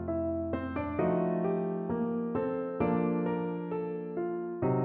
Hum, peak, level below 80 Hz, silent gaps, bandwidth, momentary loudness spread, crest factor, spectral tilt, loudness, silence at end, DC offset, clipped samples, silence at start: none; -16 dBFS; -56 dBFS; none; 3.8 kHz; 6 LU; 14 dB; -9 dB/octave; -32 LUFS; 0 s; under 0.1%; under 0.1%; 0 s